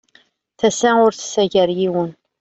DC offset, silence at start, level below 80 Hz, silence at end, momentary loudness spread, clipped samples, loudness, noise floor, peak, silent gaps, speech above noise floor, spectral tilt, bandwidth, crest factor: under 0.1%; 0.6 s; -58 dBFS; 0.3 s; 7 LU; under 0.1%; -17 LUFS; -56 dBFS; -2 dBFS; none; 40 dB; -4.5 dB/octave; 8.2 kHz; 16 dB